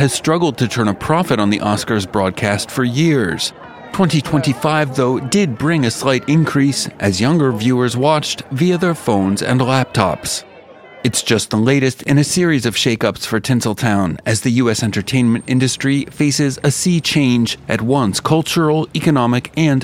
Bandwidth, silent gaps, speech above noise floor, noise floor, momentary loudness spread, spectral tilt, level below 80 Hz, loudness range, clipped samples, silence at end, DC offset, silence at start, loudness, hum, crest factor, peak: 16.5 kHz; none; 24 dB; -40 dBFS; 4 LU; -5 dB/octave; -50 dBFS; 1 LU; under 0.1%; 0 s; under 0.1%; 0 s; -16 LUFS; none; 16 dB; 0 dBFS